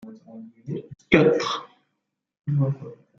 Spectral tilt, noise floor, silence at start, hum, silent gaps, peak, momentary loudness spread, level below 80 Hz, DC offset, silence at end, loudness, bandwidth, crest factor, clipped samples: -6.5 dB/octave; -79 dBFS; 0.05 s; none; none; -2 dBFS; 24 LU; -54 dBFS; under 0.1%; 0.25 s; -22 LUFS; 7.2 kHz; 24 dB; under 0.1%